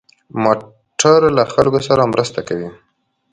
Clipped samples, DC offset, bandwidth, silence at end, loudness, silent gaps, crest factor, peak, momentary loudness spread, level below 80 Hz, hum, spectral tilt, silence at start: under 0.1%; under 0.1%; 9.6 kHz; 0.6 s; -15 LUFS; none; 16 dB; 0 dBFS; 15 LU; -50 dBFS; none; -4.5 dB/octave; 0.35 s